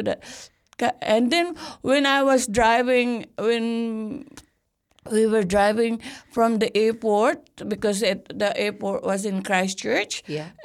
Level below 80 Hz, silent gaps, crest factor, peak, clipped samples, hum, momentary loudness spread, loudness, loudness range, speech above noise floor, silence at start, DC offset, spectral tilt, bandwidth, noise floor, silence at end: -52 dBFS; none; 16 dB; -6 dBFS; under 0.1%; none; 13 LU; -22 LUFS; 3 LU; 47 dB; 0 s; under 0.1%; -4 dB/octave; 15 kHz; -69 dBFS; 0 s